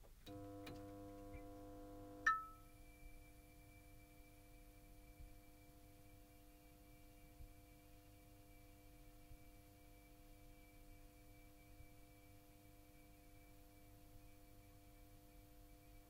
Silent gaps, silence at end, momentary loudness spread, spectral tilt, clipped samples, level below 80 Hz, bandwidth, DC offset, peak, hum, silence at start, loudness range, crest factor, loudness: none; 0 s; 11 LU; -4.5 dB/octave; under 0.1%; -66 dBFS; 16 kHz; under 0.1%; -24 dBFS; none; 0 s; 17 LU; 32 dB; -51 LUFS